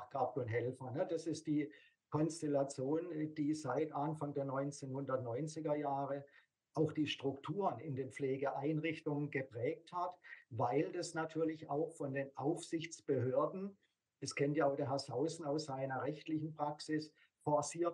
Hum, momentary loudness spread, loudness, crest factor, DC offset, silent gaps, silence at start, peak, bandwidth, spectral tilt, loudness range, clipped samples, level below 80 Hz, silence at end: none; 7 LU; -40 LUFS; 18 dB; under 0.1%; none; 0 s; -22 dBFS; 11 kHz; -6 dB/octave; 2 LU; under 0.1%; -86 dBFS; 0 s